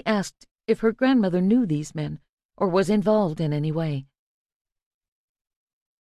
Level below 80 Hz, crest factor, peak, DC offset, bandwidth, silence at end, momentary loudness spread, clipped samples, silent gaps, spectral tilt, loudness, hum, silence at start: -58 dBFS; 16 dB; -8 dBFS; under 0.1%; 12.5 kHz; 1.95 s; 13 LU; under 0.1%; 0.51-0.55 s, 2.29-2.38 s, 2.45-2.49 s; -7 dB/octave; -23 LUFS; none; 0.05 s